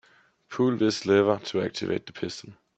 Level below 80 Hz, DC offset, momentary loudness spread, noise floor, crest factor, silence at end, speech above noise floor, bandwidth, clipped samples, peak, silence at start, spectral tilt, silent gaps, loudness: -68 dBFS; under 0.1%; 13 LU; -59 dBFS; 20 dB; 0.25 s; 33 dB; 8.4 kHz; under 0.1%; -6 dBFS; 0.5 s; -5.5 dB/octave; none; -26 LUFS